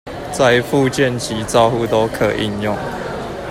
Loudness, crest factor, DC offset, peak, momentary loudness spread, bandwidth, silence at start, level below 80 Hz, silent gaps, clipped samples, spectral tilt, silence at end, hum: -17 LUFS; 16 dB; under 0.1%; 0 dBFS; 11 LU; 16 kHz; 0.05 s; -40 dBFS; none; under 0.1%; -5 dB/octave; 0 s; none